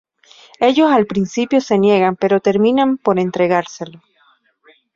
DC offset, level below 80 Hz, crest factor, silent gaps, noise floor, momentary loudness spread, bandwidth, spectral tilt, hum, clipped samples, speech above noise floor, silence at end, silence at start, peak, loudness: under 0.1%; -58 dBFS; 14 dB; none; -57 dBFS; 6 LU; 7.6 kHz; -6 dB/octave; none; under 0.1%; 42 dB; 1.05 s; 0.6 s; -2 dBFS; -15 LUFS